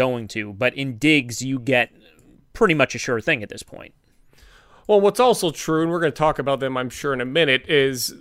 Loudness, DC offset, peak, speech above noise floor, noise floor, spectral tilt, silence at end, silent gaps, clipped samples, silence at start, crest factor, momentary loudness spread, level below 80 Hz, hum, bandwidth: -20 LUFS; under 0.1%; -2 dBFS; 32 dB; -52 dBFS; -4.5 dB/octave; 0.05 s; none; under 0.1%; 0 s; 18 dB; 9 LU; -50 dBFS; none; 16 kHz